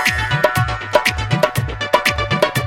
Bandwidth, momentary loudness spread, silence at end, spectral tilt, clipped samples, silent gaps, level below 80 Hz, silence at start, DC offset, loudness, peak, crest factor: 17 kHz; 3 LU; 0 s; -4.5 dB/octave; under 0.1%; none; -32 dBFS; 0 s; under 0.1%; -17 LUFS; 0 dBFS; 18 dB